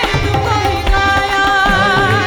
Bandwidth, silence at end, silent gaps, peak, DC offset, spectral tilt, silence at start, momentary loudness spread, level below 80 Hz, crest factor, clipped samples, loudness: over 20 kHz; 0 s; none; 0 dBFS; under 0.1%; -4.5 dB/octave; 0 s; 4 LU; -22 dBFS; 12 dB; under 0.1%; -13 LUFS